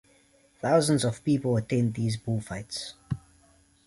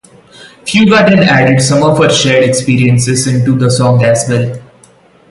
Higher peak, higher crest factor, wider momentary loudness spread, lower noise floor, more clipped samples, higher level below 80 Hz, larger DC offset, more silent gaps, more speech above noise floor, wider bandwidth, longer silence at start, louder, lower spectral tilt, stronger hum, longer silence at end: second, -10 dBFS vs 0 dBFS; first, 18 dB vs 10 dB; first, 13 LU vs 7 LU; first, -62 dBFS vs -43 dBFS; neither; second, -56 dBFS vs -42 dBFS; neither; neither; about the same, 35 dB vs 35 dB; about the same, 11.5 kHz vs 11.5 kHz; first, 0.65 s vs 0.4 s; second, -28 LUFS vs -9 LUFS; about the same, -6 dB/octave vs -5 dB/octave; neither; about the same, 0.7 s vs 0.7 s